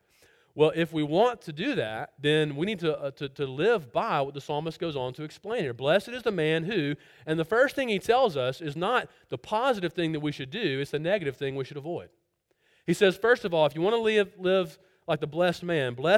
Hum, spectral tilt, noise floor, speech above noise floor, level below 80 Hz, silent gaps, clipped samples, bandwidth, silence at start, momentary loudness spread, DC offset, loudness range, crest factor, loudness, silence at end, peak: none; -6 dB/octave; -72 dBFS; 45 dB; -64 dBFS; none; under 0.1%; 15.5 kHz; 0.55 s; 10 LU; under 0.1%; 4 LU; 20 dB; -27 LUFS; 0 s; -8 dBFS